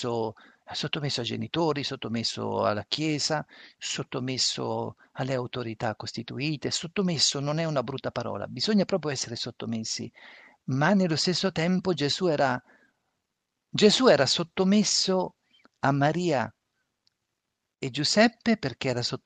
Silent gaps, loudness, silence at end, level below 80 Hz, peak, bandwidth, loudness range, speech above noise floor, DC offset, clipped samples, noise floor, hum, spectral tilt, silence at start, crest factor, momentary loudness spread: none; -27 LUFS; 0.1 s; -66 dBFS; -6 dBFS; 9.4 kHz; 6 LU; 56 dB; under 0.1%; under 0.1%; -83 dBFS; none; -4 dB/octave; 0 s; 22 dB; 12 LU